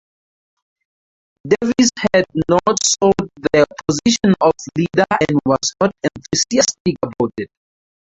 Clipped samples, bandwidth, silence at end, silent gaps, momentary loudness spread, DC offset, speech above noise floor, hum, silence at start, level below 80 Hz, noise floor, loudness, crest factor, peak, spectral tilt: under 0.1%; 8.4 kHz; 0.75 s; 6.80-6.85 s; 7 LU; under 0.1%; over 74 dB; none; 1.45 s; -48 dBFS; under -90 dBFS; -16 LUFS; 16 dB; -2 dBFS; -4 dB/octave